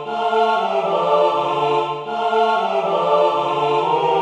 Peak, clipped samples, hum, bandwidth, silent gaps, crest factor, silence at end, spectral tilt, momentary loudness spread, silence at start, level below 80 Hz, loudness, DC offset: -4 dBFS; under 0.1%; none; 9.8 kHz; none; 14 dB; 0 s; -5.5 dB/octave; 4 LU; 0 s; -70 dBFS; -18 LUFS; under 0.1%